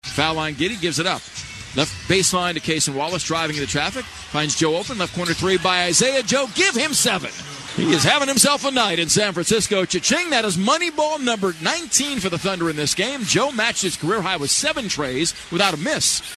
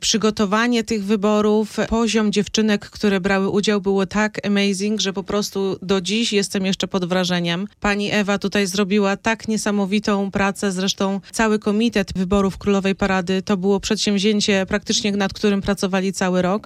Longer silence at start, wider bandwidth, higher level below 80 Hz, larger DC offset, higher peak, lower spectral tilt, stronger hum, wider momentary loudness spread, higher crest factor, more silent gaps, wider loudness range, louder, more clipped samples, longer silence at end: about the same, 0.05 s vs 0 s; about the same, 13 kHz vs 14 kHz; second, -50 dBFS vs -44 dBFS; neither; first, 0 dBFS vs -4 dBFS; second, -2.5 dB/octave vs -4.5 dB/octave; neither; first, 7 LU vs 3 LU; about the same, 20 dB vs 16 dB; neither; first, 4 LU vs 1 LU; about the same, -19 LUFS vs -20 LUFS; neither; about the same, 0 s vs 0.05 s